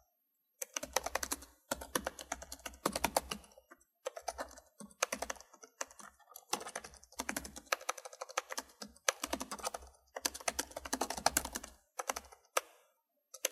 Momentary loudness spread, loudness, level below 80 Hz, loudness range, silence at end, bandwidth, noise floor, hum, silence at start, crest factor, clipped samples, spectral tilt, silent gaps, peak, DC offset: 13 LU; -40 LUFS; -62 dBFS; 5 LU; 0 s; 16 kHz; -81 dBFS; none; 0.6 s; 34 dB; under 0.1%; -1 dB/octave; none; -8 dBFS; under 0.1%